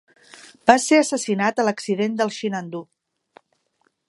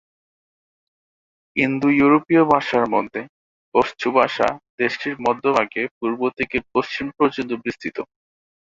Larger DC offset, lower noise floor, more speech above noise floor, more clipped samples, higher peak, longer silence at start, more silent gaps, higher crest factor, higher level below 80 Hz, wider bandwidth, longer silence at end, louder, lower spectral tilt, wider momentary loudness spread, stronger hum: neither; second, -68 dBFS vs under -90 dBFS; second, 48 dB vs over 70 dB; neither; about the same, 0 dBFS vs -2 dBFS; second, 0.65 s vs 1.55 s; second, none vs 3.29-3.72 s, 4.70-4.78 s, 5.91-6.01 s; about the same, 22 dB vs 20 dB; second, -68 dBFS vs -56 dBFS; first, 11.5 kHz vs 7.6 kHz; first, 1.25 s vs 0.6 s; about the same, -20 LUFS vs -20 LUFS; second, -4 dB/octave vs -6.5 dB/octave; about the same, 13 LU vs 12 LU; neither